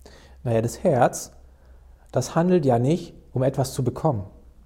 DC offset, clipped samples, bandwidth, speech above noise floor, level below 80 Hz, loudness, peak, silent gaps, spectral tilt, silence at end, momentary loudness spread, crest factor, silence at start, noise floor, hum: under 0.1%; under 0.1%; 16.5 kHz; 27 dB; -48 dBFS; -23 LUFS; -6 dBFS; none; -6.5 dB/octave; 0.35 s; 13 LU; 18 dB; 0.45 s; -49 dBFS; none